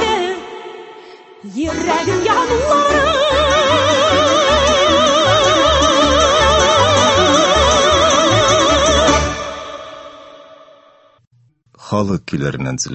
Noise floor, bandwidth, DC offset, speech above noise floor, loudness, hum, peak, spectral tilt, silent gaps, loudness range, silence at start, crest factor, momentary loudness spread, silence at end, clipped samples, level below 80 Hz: -52 dBFS; 8.6 kHz; under 0.1%; 36 dB; -12 LUFS; none; 0 dBFS; -3 dB/octave; 11.27-11.31 s; 10 LU; 0 s; 14 dB; 13 LU; 0 s; under 0.1%; -30 dBFS